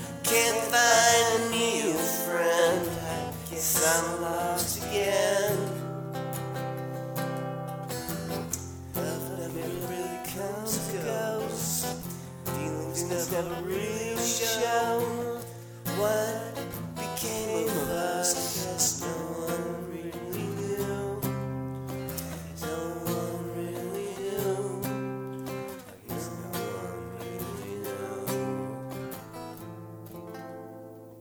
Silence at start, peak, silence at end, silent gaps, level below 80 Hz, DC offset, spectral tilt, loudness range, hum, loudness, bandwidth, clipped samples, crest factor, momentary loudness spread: 0 s; -8 dBFS; 0 s; none; -56 dBFS; under 0.1%; -3.5 dB/octave; 9 LU; none; -29 LUFS; over 20 kHz; under 0.1%; 22 dB; 14 LU